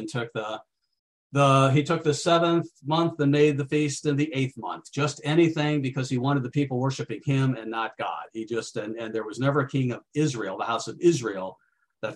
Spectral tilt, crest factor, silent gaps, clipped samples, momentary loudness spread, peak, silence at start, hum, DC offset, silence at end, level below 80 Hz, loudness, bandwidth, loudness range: -6 dB/octave; 20 dB; 0.99-1.30 s; under 0.1%; 11 LU; -6 dBFS; 0 s; none; under 0.1%; 0 s; -68 dBFS; -25 LUFS; 11 kHz; 5 LU